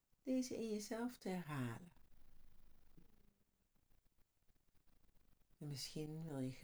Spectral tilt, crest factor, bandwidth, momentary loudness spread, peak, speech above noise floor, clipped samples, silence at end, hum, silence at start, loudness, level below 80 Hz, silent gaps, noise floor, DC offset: -5.5 dB/octave; 16 dB; over 20 kHz; 10 LU; -32 dBFS; 34 dB; under 0.1%; 0 s; none; 0.25 s; -47 LUFS; -70 dBFS; none; -79 dBFS; under 0.1%